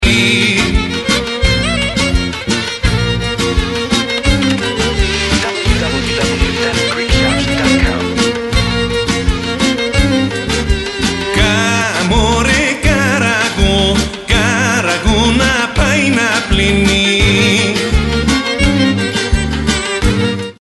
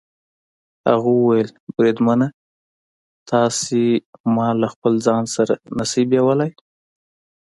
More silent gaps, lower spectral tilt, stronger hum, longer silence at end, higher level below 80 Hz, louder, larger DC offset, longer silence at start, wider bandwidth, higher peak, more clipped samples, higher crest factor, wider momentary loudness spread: second, none vs 1.60-1.67 s, 2.34-3.26 s, 4.06-4.13 s, 4.20-4.24 s, 4.76-4.82 s; second, -4 dB/octave vs -5.5 dB/octave; neither; second, 0.1 s vs 0.9 s; first, -20 dBFS vs -60 dBFS; first, -13 LUFS vs -18 LUFS; neither; second, 0 s vs 0.85 s; about the same, 12 kHz vs 11.5 kHz; about the same, 0 dBFS vs -2 dBFS; neither; second, 12 dB vs 18 dB; about the same, 5 LU vs 6 LU